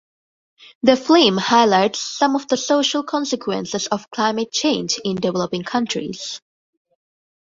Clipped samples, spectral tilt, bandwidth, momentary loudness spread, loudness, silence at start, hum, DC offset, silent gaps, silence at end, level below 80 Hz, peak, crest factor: under 0.1%; -3.5 dB/octave; 7.8 kHz; 10 LU; -19 LUFS; 0.6 s; none; under 0.1%; 0.75-0.81 s; 1.1 s; -62 dBFS; -2 dBFS; 18 dB